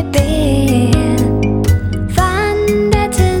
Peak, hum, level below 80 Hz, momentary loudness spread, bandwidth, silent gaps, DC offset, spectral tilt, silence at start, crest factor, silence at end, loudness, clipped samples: 0 dBFS; none; -22 dBFS; 2 LU; 19 kHz; none; under 0.1%; -6 dB/octave; 0 s; 12 dB; 0 s; -14 LUFS; under 0.1%